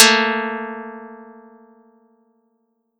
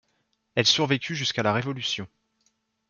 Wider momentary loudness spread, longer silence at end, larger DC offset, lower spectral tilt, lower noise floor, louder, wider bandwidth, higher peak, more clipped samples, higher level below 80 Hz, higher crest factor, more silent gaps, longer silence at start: first, 25 LU vs 10 LU; first, 1.7 s vs 0.85 s; neither; second, -0.5 dB/octave vs -3.5 dB/octave; second, -68 dBFS vs -73 dBFS; first, -18 LUFS vs -24 LUFS; first, over 20 kHz vs 7.4 kHz; first, 0 dBFS vs -6 dBFS; neither; second, -78 dBFS vs -68 dBFS; about the same, 22 dB vs 22 dB; neither; second, 0 s vs 0.55 s